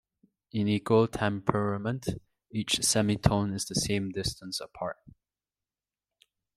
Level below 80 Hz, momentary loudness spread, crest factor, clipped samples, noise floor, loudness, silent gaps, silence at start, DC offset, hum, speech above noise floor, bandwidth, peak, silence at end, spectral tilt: -52 dBFS; 13 LU; 24 dB; under 0.1%; under -90 dBFS; -29 LUFS; none; 0.55 s; under 0.1%; none; over 61 dB; 15 kHz; -6 dBFS; 1.45 s; -4.5 dB/octave